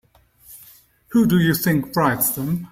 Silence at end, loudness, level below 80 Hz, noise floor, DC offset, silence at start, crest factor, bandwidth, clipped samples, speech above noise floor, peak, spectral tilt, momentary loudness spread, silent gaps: 0.05 s; -19 LUFS; -50 dBFS; -50 dBFS; under 0.1%; 0.5 s; 16 dB; 16.5 kHz; under 0.1%; 32 dB; -4 dBFS; -5.5 dB/octave; 5 LU; none